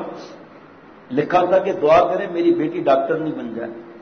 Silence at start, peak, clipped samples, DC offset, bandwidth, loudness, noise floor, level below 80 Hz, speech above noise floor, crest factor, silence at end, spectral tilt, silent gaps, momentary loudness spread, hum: 0 s; -6 dBFS; under 0.1%; under 0.1%; 6.6 kHz; -18 LUFS; -44 dBFS; -58 dBFS; 26 dB; 14 dB; 0 s; -7 dB/octave; none; 17 LU; none